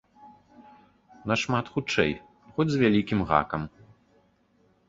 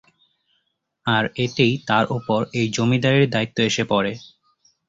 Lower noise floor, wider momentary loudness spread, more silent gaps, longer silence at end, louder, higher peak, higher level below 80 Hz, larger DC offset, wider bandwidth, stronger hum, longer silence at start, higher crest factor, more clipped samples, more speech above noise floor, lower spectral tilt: second, -65 dBFS vs -72 dBFS; first, 14 LU vs 6 LU; neither; first, 1.2 s vs 0.65 s; second, -26 LUFS vs -20 LUFS; about the same, -4 dBFS vs -4 dBFS; about the same, -52 dBFS vs -56 dBFS; neither; about the same, 7.8 kHz vs 7.8 kHz; neither; second, 0.25 s vs 1.05 s; first, 24 dB vs 18 dB; neither; second, 40 dB vs 52 dB; about the same, -6 dB/octave vs -5.5 dB/octave